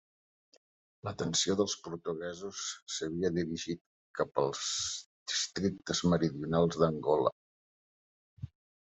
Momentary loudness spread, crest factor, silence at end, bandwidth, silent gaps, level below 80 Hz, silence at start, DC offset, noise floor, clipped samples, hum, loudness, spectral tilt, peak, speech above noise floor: 14 LU; 22 dB; 0.45 s; 8.2 kHz; 2.82-2.86 s, 3.81-4.14 s, 5.06-5.26 s, 7.32-8.37 s; -66 dBFS; 1.05 s; under 0.1%; under -90 dBFS; under 0.1%; none; -33 LUFS; -4 dB/octave; -12 dBFS; over 58 dB